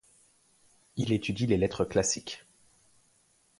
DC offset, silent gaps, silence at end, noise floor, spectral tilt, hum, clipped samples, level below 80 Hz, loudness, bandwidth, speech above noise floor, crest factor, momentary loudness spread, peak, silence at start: under 0.1%; none; 1.2 s; -67 dBFS; -4.5 dB/octave; none; under 0.1%; -54 dBFS; -29 LUFS; 11.5 kHz; 39 dB; 22 dB; 15 LU; -12 dBFS; 0.95 s